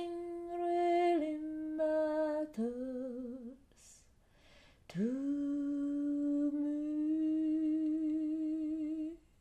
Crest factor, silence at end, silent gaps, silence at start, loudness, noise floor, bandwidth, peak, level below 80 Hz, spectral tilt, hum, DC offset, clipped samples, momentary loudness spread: 14 dB; 0.2 s; none; 0 s; -36 LUFS; -65 dBFS; 9.2 kHz; -22 dBFS; -68 dBFS; -7 dB/octave; none; under 0.1%; under 0.1%; 10 LU